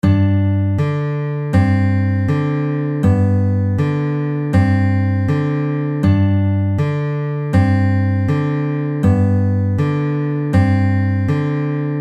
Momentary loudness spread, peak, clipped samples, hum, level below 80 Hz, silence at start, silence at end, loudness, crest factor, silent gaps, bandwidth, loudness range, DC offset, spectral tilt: 5 LU; -2 dBFS; under 0.1%; none; -40 dBFS; 0.05 s; 0 s; -17 LUFS; 14 dB; none; 5 kHz; 0 LU; under 0.1%; -9.5 dB/octave